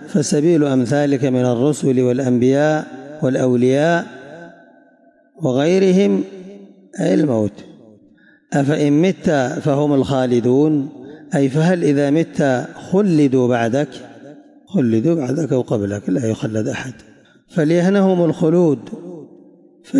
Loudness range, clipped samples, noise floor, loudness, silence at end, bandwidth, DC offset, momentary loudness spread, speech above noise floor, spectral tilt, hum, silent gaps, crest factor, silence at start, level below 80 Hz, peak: 3 LU; under 0.1%; -52 dBFS; -17 LUFS; 0 s; 11.5 kHz; under 0.1%; 11 LU; 37 dB; -7 dB/octave; none; none; 12 dB; 0 s; -60 dBFS; -4 dBFS